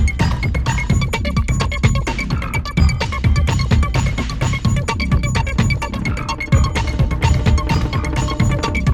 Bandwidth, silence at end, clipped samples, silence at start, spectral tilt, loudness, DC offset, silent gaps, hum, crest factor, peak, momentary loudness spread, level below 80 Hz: 16.5 kHz; 0 s; under 0.1%; 0 s; -5.5 dB/octave; -18 LUFS; under 0.1%; none; none; 16 dB; 0 dBFS; 4 LU; -20 dBFS